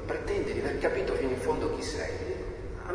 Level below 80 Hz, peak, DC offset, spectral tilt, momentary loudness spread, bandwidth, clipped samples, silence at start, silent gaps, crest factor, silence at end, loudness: -42 dBFS; -16 dBFS; under 0.1%; -5.5 dB/octave; 7 LU; 10.5 kHz; under 0.1%; 0 s; none; 16 dB; 0 s; -32 LUFS